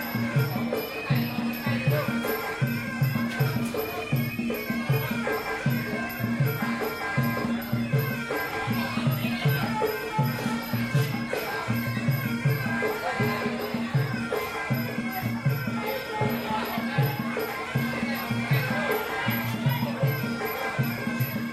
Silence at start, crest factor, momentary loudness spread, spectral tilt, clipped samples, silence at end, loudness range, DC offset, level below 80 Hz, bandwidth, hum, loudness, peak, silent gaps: 0 s; 16 dB; 3 LU; -6.5 dB/octave; under 0.1%; 0 s; 1 LU; under 0.1%; -56 dBFS; 14 kHz; none; -28 LUFS; -12 dBFS; none